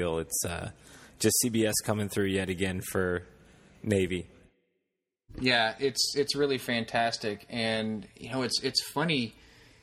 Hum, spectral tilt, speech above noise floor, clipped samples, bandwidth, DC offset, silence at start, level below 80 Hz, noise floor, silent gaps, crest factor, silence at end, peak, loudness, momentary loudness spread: none; -3.5 dB/octave; 55 dB; under 0.1%; 16 kHz; under 0.1%; 0 s; -58 dBFS; -84 dBFS; none; 20 dB; 0.5 s; -10 dBFS; -29 LUFS; 11 LU